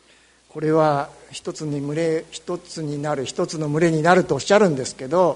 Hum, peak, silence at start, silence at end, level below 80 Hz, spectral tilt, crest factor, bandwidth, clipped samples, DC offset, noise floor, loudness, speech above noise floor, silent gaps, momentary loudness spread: none; 0 dBFS; 0.55 s; 0 s; -58 dBFS; -5.5 dB/octave; 20 dB; 11 kHz; under 0.1%; under 0.1%; -55 dBFS; -21 LUFS; 34 dB; none; 14 LU